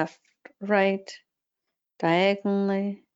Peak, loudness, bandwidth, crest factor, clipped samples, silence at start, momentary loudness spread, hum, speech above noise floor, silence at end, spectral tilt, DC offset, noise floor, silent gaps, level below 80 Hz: -8 dBFS; -25 LUFS; 7.8 kHz; 18 dB; under 0.1%; 0 s; 12 LU; none; 59 dB; 0.2 s; -6.5 dB/octave; under 0.1%; -85 dBFS; none; -76 dBFS